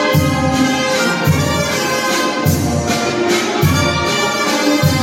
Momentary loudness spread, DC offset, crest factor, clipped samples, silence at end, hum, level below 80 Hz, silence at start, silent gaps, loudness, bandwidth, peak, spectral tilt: 2 LU; under 0.1%; 12 dB; under 0.1%; 0 s; none; -40 dBFS; 0 s; none; -15 LUFS; 17 kHz; -2 dBFS; -4.5 dB/octave